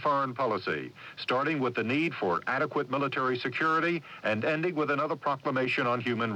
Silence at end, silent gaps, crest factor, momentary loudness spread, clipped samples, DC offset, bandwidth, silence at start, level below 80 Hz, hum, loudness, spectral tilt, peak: 0 s; none; 14 dB; 4 LU; under 0.1%; under 0.1%; 11 kHz; 0 s; -76 dBFS; none; -29 LUFS; -6.5 dB/octave; -16 dBFS